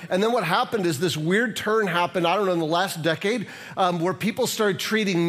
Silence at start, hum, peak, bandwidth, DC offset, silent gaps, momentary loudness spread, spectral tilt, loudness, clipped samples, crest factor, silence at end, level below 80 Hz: 0 s; none; -6 dBFS; 15.5 kHz; under 0.1%; none; 3 LU; -4.5 dB/octave; -23 LUFS; under 0.1%; 18 dB; 0 s; -70 dBFS